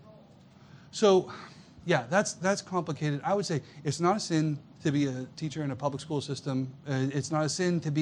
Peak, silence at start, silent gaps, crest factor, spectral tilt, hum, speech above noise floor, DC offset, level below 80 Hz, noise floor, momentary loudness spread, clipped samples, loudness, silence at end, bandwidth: -10 dBFS; 0.05 s; none; 20 dB; -5.5 dB/octave; none; 26 dB; under 0.1%; -68 dBFS; -55 dBFS; 9 LU; under 0.1%; -30 LUFS; 0 s; 11 kHz